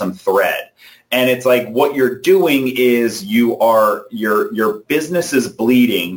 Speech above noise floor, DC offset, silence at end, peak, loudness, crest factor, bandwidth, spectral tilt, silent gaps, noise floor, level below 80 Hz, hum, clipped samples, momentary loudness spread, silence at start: 27 dB; under 0.1%; 0 s; -2 dBFS; -15 LUFS; 12 dB; 17 kHz; -4.5 dB/octave; none; -42 dBFS; -60 dBFS; none; under 0.1%; 6 LU; 0 s